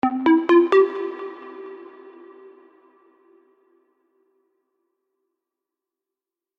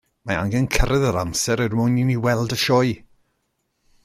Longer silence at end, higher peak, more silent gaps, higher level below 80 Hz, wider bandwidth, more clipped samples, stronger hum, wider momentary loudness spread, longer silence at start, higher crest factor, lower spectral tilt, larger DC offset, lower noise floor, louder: first, 4.75 s vs 1.05 s; about the same, -6 dBFS vs -4 dBFS; neither; second, -70 dBFS vs -32 dBFS; second, 5.6 kHz vs 16 kHz; neither; neither; first, 25 LU vs 6 LU; second, 0.05 s vs 0.25 s; about the same, 20 dB vs 18 dB; about the same, -6 dB/octave vs -5 dB/octave; neither; first, -89 dBFS vs -72 dBFS; first, -18 LUFS vs -21 LUFS